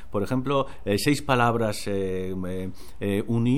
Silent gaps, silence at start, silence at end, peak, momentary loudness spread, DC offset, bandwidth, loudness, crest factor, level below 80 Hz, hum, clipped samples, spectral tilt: none; 0 s; 0 s; -8 dBFS; 11 LU; 2%; 16.5 kHz; -26 LUFS; 18 dB; -46 dBFS; none; under 0.1%; -6 dB/octave